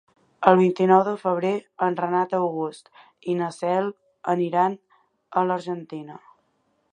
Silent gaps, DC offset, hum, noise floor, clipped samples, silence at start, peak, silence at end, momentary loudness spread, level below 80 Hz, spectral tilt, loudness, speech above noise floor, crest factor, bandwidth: none; under 0.1%; none; -69 dBFS; under 0.1%; 0.4 s; 0 dBFS; 0.75 s; 15 LU; -74 dBFS; -7.5 dB/octave; -23 LUFS; 47 dB; 24 dB; 9.8 kHz